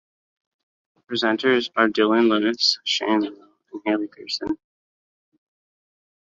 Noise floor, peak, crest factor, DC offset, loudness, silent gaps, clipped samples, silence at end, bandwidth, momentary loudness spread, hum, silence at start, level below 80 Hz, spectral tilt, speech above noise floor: under -90 dBFS; -4 dBFS; 20 dB; under 0.1%; -21 LUFS; none; under 0.1%; 1.75 s; 7.6 kHz; 12 LU; none; 1.1 s; -66 dBFS; -3.5 dB/octave; over 69 dB